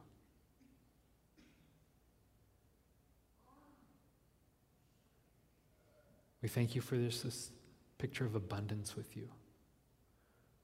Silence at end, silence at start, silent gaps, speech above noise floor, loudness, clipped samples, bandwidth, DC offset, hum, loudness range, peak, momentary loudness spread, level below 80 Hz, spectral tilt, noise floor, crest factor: 1.2 s; 0 s; none; 32 dB; -42 LUFS; under 0.1%; 16 kHz; under 0.1%; none; 5 LU; -22 dBFS; 13 LU; -74 dBFS; -5.5 dB/octave; -73 dBFS; 24 dB